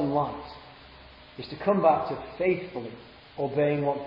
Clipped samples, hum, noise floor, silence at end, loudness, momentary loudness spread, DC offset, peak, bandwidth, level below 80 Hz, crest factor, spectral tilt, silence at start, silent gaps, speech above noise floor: under 0.1%; none; -50 dBFS; 0 s; -27 LUFS; 23 LU; under 0.1%; -8 dBFS; 5.6 kHz; -58 dBFS; 20 dB; -10 dB/octave; 0 s; none; 23 dB